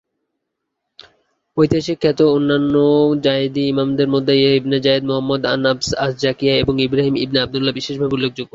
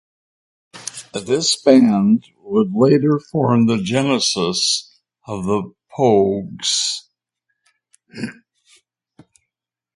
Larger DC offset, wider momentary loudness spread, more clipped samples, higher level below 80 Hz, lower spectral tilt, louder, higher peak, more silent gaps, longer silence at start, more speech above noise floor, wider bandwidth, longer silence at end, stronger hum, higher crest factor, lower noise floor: neither; second, 5 LU vs 18 LU; neither; first, -46 dBFS vs -56 dBFS; first, -6 dB/octave vs -4.5 dB/octave; about the same, -16 LUFS vs -17 LUFS; about the same, -2 dBFS vs 0 dBFS; neither; first, 1.55 s vs 0.75 s; second, 60 dB vs 68 dB; second, 7.8 kHz vs 11.5 kHz; second, 0.1 s vs 1.65 s; neither; about the same, 16 dB vs 18 dB; second, -76 dBFS vs -84 dBFS